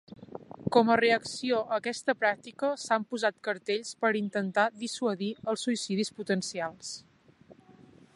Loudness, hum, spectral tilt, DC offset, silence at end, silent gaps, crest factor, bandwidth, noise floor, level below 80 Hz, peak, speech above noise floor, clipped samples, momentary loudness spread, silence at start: -29 LUFS; none; -4 dB/octave; under 0.1%; 0.65 s; none; 22 dB; 11.5 kHz; -58 dBFS; -72 dBFS; -8 dBFS; 28 dB; under 0.1%; 12 LU; 0.1 s